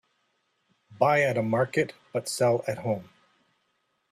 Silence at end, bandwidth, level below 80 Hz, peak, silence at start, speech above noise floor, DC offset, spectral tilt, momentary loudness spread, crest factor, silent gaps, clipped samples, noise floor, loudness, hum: 1.1 s; 15 kHz; -68 dBFS; -8 dBFS; 0.9 s; 48 dB; under 0.1%; -5 dB/octave; 9 LU; 20 dB; none; under 0.1%; -74 dBFS; -26 LUFS; none